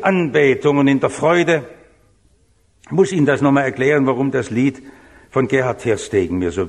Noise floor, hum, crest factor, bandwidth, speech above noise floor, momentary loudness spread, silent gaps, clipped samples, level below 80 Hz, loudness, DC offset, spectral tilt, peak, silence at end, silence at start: -57 dBFS; none; 16 dB; 11 kHz; 41 dB; 6 LU; none; under 0.1%; -50 dBFS; -17 LUFS; under 0.1%; -6.5 dB/octave; -2 dBFS; 0 s; 0 s